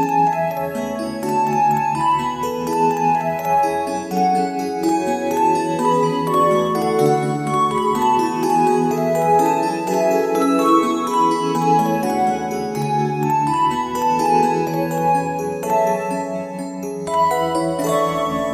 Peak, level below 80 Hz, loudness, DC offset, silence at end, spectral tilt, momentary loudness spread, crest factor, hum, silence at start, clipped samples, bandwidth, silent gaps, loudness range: -2 dBFS; -54 dBFS; -18 LUFS; under 0.1%; 0 s; -5.5 dB/octave; 6 LU; 16 dB; none; 0 s; under 0.1%; 14 kHz; none; 3 LU